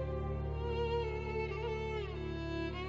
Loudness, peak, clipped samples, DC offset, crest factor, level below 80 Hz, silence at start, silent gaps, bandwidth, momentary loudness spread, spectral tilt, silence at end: -38 LUFS; -26 dBFS; under 0.1%; 0.1%; 12 dB; -44 dBFS; 0 s; none; 7.4 kHz; 4 LU; -5.5 dB/octave; 0 s